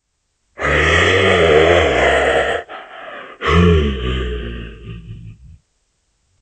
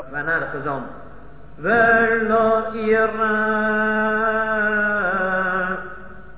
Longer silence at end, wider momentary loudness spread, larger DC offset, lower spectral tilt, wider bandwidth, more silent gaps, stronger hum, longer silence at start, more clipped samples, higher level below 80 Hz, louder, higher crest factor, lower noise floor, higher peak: first, 0.9 s vs 0 s; first, 21 LU vs 12 LU; second, under 0.1% vs 1%; second, -5.5 dB/octave vs -9 dB/octave; first, 9 kHz vs 4 kHz; neither; neither; first, 0.6 s vs 0 s; neither; first, -28 dBFS vs -48 dBFS; first, -14 LUFS vs -19 LUFS; about the same, 16 dB vs 16 dB; first, -68 dBFS vs -42 dBFS; first, 0 dBFS vs -4 dBFS